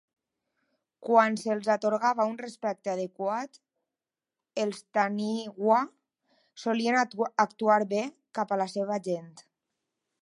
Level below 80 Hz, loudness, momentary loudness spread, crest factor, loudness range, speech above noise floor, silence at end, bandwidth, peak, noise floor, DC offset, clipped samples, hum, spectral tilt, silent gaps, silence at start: -84 dBFS; -28 LUFS; 11 LU; 22 dB; 4 LU; over 62 dB; 0.8 s; 11.5 kHz; -8 dBFS; under -90 dBFS; under 0.1%; under 0.1%; none; -5 dB/octave; none; 1 s